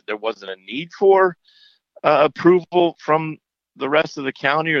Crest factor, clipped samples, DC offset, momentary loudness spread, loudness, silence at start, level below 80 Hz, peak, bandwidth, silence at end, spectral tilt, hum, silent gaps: 16 dB; under 0.1%; under 0.1%; 14 LU; -18 LUFS; 0.1 s; -74 dBFS; -4 dBFS; 6.8 kHz; 0 s; -6.5 dB/octave; none; none